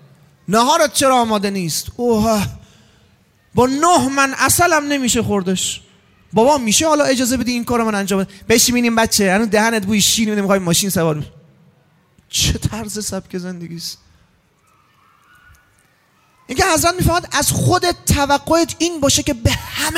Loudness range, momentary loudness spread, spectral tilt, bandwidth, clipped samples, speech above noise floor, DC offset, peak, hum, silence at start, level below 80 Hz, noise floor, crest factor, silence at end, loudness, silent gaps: 9 LU; 11 LU; -3.5 dB/octave; 16 kHz; under 0.1%; 41 dB; under 0.1%; 0 dBFS; none; 0.5 s; -38 dBFS; -57 dBFS; 16 dB; 0 s; -16 LUFS; none